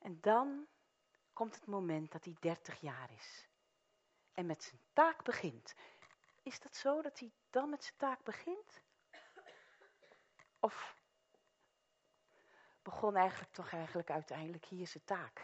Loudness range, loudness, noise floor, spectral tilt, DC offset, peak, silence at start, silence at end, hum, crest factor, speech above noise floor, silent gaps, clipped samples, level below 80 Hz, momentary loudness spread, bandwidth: 9 LU; -41 LUFS; -80 dBFS; -4 dB/octave; under 0.1%; -18 dBFS; 0 s; 0 s; none; 26 dB; 40 dB; none; under 0.1%; -88 dBFS; 22 LU; 8 kHz